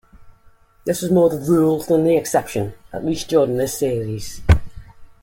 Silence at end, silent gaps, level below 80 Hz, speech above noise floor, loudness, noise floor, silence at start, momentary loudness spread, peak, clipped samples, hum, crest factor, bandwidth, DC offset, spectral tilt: 0.15 s; none; -32 dBFS; 32 dB; -19 LUFS; -51 dBFS; 0.15 s; 10 LU; -2 dBFS; under 0.1%; none; 18 dB; 17 kHz; under 0.1%; -6.5 dB/octave